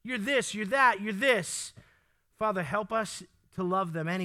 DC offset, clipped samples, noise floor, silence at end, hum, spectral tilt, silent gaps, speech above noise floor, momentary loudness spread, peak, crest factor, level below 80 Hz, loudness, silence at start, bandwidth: under 0.1%; under 0.1%; -68 dBFS; 0 s; none; -4 dB/octave; none; 39 dB; 13 LU; -10 dBFS; 20 dB; -68 dBFS; -29 LUFS; 0.05 s; 15.5 kHz